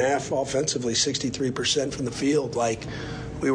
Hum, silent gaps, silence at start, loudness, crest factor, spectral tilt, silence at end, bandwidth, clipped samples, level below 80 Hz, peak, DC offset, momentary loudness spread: none; none; 0 s; -25 LUFS; 14 dB; -3.5 dB/octave; 0 s; 10.5 kHz; under 0.1%; -48 dBFS; -12 dBFS; under 0.1%; 8 LU